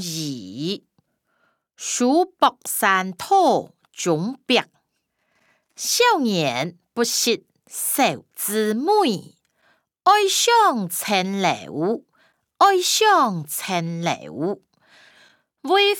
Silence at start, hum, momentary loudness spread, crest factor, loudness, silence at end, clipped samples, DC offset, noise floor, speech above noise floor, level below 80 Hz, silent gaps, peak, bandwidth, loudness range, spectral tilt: 0 s; none; 12 LU; 18 dB; -20 LUFS; 0 s; under 0.1%; under 0.1%; -73 dBFS; 53 dB; -74 dBFS; none; -4 dBFS; over 20 kHz; 3 LU; -3 dB/octave